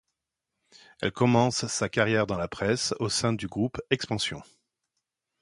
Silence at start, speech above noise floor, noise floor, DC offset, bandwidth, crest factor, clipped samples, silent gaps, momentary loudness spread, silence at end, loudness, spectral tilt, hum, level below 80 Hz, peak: 1 s; 58 dB; -85 dBFS; under 0.1%; 11.5 kHz; 22 dB; under 0.1%; none; 8 LU; 1 s; -27 LUFS; -4.5 dB/octave; none; -56 dBFS; -6 dBFS